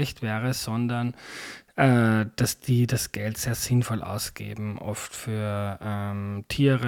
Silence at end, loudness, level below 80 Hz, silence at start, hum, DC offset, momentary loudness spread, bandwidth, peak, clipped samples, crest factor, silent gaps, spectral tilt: 0 s; -27 LUFS; -52 dBFS; 0 s; none; under 0.1%; 11 LU; 17.5 kHz; -8 dBFS; under 0.1%; 18 dB; none; -5.5 dB/octave